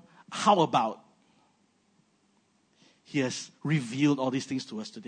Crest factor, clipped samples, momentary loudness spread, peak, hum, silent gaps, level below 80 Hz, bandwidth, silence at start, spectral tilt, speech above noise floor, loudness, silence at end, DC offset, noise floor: 20 dB; under 0.1%; 12 LU; -10 dBFS; none; none; -80 dBFS; 9.6 kHz; 0.3 s; -5.5 dB/octave; 41 dB; -28 LUFS; 0.05 s; under 0.1%; -69 dBFS